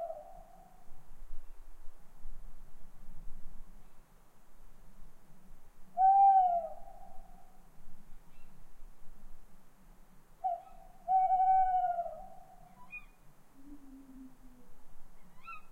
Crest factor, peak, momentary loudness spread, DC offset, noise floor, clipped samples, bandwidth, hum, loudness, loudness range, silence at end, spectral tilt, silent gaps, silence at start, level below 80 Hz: 18 dB; -18 dBFS; 31 LU; under 0.1%; -56 dBFS; under 0.1%; 4 kHz; none; -30 LUFS; 21 LU; 0 s; -6 dB/octave; none; 0 s; -50 dBFS